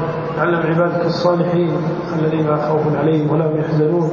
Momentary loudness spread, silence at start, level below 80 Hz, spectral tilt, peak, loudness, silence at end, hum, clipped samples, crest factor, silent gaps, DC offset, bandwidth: 3 LU; 0 s; -50 dBFS; -8.5 dB/octave; -2 dBFS; -17 LUFS; 0 s; none; under 0.1%; 14 dB; none; under 0.1%; 7 kHz